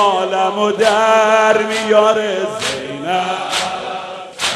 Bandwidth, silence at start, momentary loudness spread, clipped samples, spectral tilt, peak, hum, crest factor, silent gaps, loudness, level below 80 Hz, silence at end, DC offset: 13.5 kHz; 0 s; 11 LU; under 0.1%; -2.5 dB/octave; 0 dBFS; none; 16 dB; none; -15 LUFS; -58 dBFS; 0 s; under 0.1%